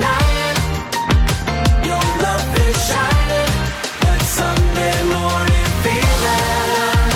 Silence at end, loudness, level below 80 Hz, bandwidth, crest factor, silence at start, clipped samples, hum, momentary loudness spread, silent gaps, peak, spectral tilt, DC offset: 0 s; -16 LUFS; -20 dBFS; 19 kHz; 12 dB; 0 s; under 0.1%; none; 3 LU; none; -2 dBFS; -4.5 dB/octave; under 0.1%